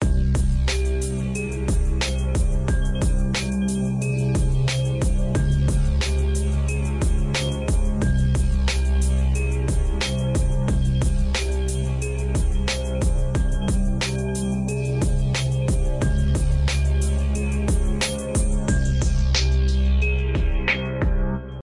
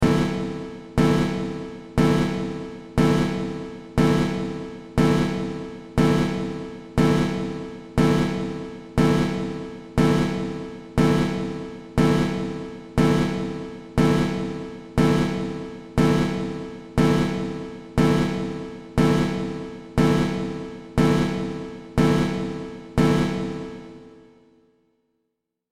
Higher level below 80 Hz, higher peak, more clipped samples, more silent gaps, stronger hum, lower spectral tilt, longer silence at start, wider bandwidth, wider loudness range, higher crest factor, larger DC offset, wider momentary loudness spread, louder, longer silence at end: first, -22 dBFS vs -38 dBFS; about the same, -8 dBFS vs -8 dBFS; neither; neither; neither; second, -5.5 dB/octave vs -7 dB/octave; about the same, 0 s vs 0 s; second, 11.5 kHz vs 14.5 kHz; about the same, 2 LU vs 0 LU; about the same, 12 dB vs 16 dB; neither; second, 3 LU vs 14 LU; about the same, -23 LUFS vs -23 LUFS; second, 0 s vs 1.55 s